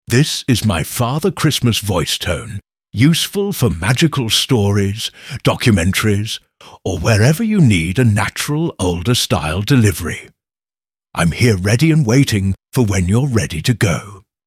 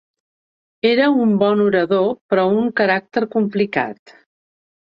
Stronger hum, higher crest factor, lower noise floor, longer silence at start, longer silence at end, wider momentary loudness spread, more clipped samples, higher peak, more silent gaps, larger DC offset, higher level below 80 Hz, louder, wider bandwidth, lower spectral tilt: neither; about the same, 14 dB vs 16 dB; about the same, under -90 dBFS vs under -90 dBFS; second, 0.1 s vs 0.85 s; second, 0.25 s vs 0.95 s; first, 10 LU vs 6 LU; neither; about the same, -2 dBFS vs -2 dBFS; second, none vs 2.21-2.29 s; neither; first, -38 dBFS vs -64 dBFS; about the same, -15 LUFS vs -17 LUFS; first, 16 kHz vs 5.6 kHz; second, -5 dB/octave vs -8.5 dB/octave